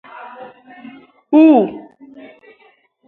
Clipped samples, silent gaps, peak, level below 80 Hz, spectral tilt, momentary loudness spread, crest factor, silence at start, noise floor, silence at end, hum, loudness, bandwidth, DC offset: under 0.1%; none; 0 dBFS; -68 dBFS; -9 dB/octave; 26 LU; 18 dB; 0.25 s; -54 dBFS; 1.25 s; none; -12 LUFS; 4 kHz; under 0.1%